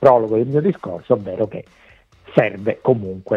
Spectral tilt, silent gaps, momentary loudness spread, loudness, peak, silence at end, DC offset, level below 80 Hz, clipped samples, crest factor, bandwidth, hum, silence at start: -9.5 dB/octave; none; 9 LU; -19 LUFS; 0 dBFS; 0 s; under 0.1%; -56 dBFS; under 0.1%; 18 dB; 7.2 kHz; none; 0 s